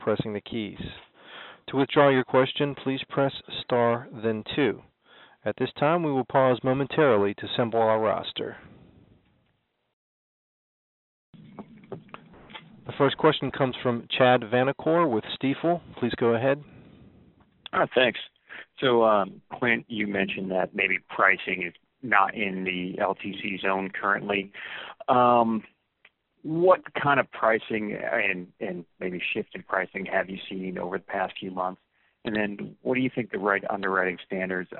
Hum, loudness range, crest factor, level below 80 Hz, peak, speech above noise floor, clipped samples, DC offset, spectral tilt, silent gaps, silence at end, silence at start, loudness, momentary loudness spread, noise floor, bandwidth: none; 6 LU; 24 dB; -64 dBFS; -4 dBFS; 47 dB; under 0.1%; under 0.1%; -3.5 dB/octave; 9.93-11.33 s; 0 s; 0 s; -26 LUFS; 15 LU; -73 dBFS; 4.2 kHz